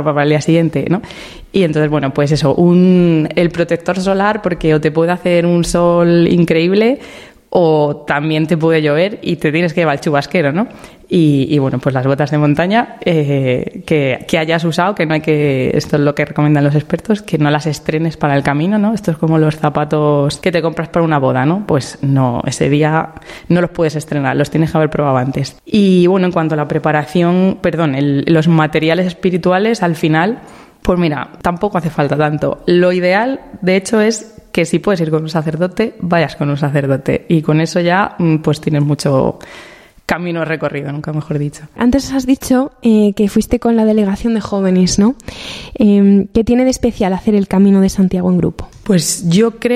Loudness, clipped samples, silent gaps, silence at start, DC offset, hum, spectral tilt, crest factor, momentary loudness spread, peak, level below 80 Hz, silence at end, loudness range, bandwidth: -14 LUFS; under 0.1%; none; 0 s; under 0.1%; none; -6.5 dB/octave; 12 dB; 7 LU; 0 dBFS; -40 dBFS; 0 s; 3 LU; 14.5 kHz